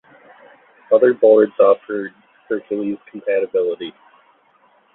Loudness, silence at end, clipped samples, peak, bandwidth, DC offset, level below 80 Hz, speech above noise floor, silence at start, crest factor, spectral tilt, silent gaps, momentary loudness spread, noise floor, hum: -17 LUFS; 1.05 s; under 0.1%; -2 dBFS; 4 kHz; under 0.1%; -66 dBFS; 40 dB; 0.9 s; 16 dB; -10.5 dB/octave; none; 15 LU; -56 dBFS; none